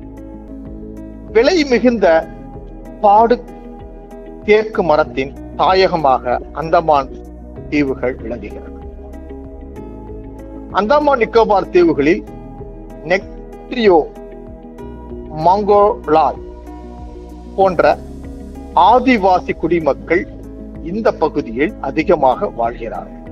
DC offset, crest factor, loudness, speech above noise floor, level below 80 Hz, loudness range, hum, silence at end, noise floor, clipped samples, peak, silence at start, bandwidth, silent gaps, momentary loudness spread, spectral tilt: under 0.1%; 16 dB; -14 LUFS; 19 dB; -34 dBFS; 5 LU; none; 0 s; -33 dBFS; under 0.1%; 0 dBFS; 0 s; 7.6 kHz; none; 21 LU; -6.5 dB/octave